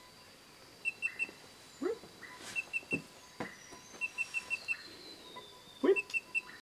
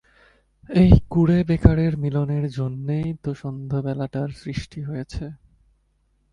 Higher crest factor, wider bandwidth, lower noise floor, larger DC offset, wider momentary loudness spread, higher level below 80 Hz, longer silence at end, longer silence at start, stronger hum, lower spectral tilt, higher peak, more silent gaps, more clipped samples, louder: about the same, 22 dB vs 22 dB; first, 16 kHz vs 9.6 kHz; second, -57 dBFS vs -65 dBFS; neither; first, 21 LU vs 16 LU; second, -74 dBFS vs -32 dBFS; second, 0 s vs 0.95 s; second, 0 s vs 0.7 s; neither; second, -3.5 dB/octave vs -9 dB/octave; second, -18 dBFS vs 0 dBFS; neither; neither; second, -37 LUFS vs -22 LUFS